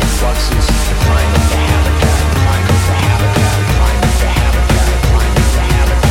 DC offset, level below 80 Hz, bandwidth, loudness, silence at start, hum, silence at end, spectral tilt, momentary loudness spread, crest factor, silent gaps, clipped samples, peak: under 0.1%; -14 dBFS; 16.5 kHz; -12 LUFS; 0 s; none; 0 s; -5 dB/octave; 2 LU; 10 dB; none; under 0.1%; 0 dBFS